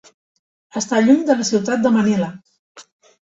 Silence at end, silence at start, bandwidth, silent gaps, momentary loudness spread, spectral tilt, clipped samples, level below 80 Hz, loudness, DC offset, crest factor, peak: 0.45 s; 0.75 s; 8 kHz; 2.59-2.75 s; 12 LU; -5 dB/octave; under 0.1%; -62 dBFS; -17 LUFS; under 0.1%; 16 dB; -4 dBFS